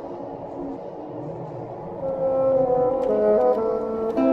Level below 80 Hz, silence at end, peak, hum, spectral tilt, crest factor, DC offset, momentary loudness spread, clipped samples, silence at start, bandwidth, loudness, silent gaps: -52 dBFS; 0 s; -8 dBFS; none; -9.5 dB/octave; 16 dB; under 0.1%; 15 LU; under 0.1%; 0 s; 5.4 kHz; -23 LUFS; none